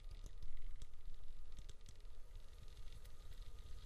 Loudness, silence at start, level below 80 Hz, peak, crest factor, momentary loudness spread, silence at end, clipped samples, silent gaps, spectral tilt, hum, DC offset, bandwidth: -60 LUFS; 0 s; -50 dBFS; -32 dBFS; 12 dB; 4 LU; 0 s; under 0.1%; none; -4.5 dB/octave; none; under 0.1%; 8.4 kHz